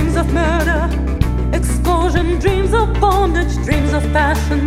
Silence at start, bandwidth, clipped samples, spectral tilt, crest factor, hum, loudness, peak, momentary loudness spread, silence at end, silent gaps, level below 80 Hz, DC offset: 0 s; 14.5 kHz; under 0.1%; -6.5 dB/octave; 14 dB; none; -16 LUFS; 0 dBFS; 4 LU; 0 s; none; -18 dBFS; under 0.1%